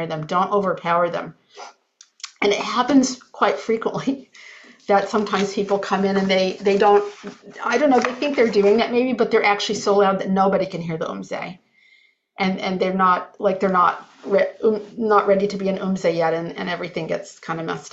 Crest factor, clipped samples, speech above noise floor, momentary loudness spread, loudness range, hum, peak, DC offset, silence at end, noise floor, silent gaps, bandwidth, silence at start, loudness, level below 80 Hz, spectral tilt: 18 dB; under 0.1%; 37 dB; 12 LU; 4 LU; none; -4 dBFS; under 0.1%; 0.05 s; -57 dBFS; none; 8 kHz; 0 s; -20 LUFS; -64 dBFS; -5 dB/octave